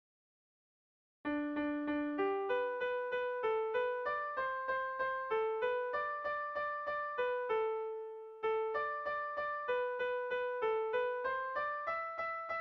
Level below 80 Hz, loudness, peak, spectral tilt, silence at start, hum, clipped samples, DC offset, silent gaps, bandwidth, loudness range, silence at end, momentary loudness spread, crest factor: -74 dBFS; -37 LUFS; -24 dBFS; -1.5 dB/octave; 1.25 s; none; under 0.1%; under 0.1%; none; 6 kHz; 1 LU; 0 s; 3 LU; 12 dB